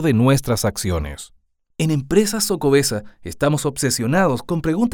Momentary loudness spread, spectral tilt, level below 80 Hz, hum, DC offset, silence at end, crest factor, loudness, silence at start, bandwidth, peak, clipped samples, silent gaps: 11 LU; -5 dB/octave; -40 dBFS; none; under 0.1%; 0 s; 18 dB; -19 LUFS; 0 s; over 20 kHz; -2 dBFS; under 0.1%; none